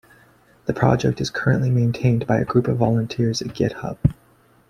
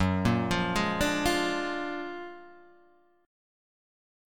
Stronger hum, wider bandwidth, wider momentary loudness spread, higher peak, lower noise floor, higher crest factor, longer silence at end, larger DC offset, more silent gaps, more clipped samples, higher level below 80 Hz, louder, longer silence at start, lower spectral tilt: neither; second, 10 kHz vs 18 kHz; second, 5 LU vs 15 LU; first, -2 dBFS vs -12 dBFS; second, -54 dBFS vs -62 dBFS; about the same, 18 dB vs 20 dB; second, 0.55 s vs 1 s; second, under 0.1% vs 0.3%; neither; neither; first, -42 dBFS vs -48 dBFS; first, -21 LUFS vs -29 LUFS; first, 0.65 s vs 0 s; first, -7 dB/octave vs -5 dB/octave